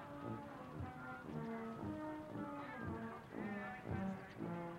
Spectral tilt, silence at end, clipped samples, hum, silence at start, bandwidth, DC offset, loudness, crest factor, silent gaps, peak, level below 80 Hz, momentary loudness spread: -8 dB/octave; 0 s; under 0.1%; none; 0 s; 16 kHz; under 0.1%; -48 LUFS; 16 dB; none; -30 dBFS; -70 dBFS; 5 LU